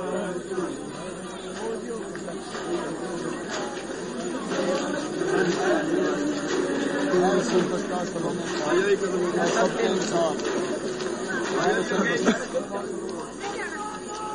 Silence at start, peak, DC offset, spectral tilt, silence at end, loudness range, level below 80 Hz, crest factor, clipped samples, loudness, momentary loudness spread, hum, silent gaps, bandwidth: 0 s; -8 dBFS; under 0.1%; -4.5 dB/octave; 0 s; 7 LU; -58 dBFS; 20 dB; under 0.1%; -27 LUFS; 10 LU; none; none; 10.5 kHz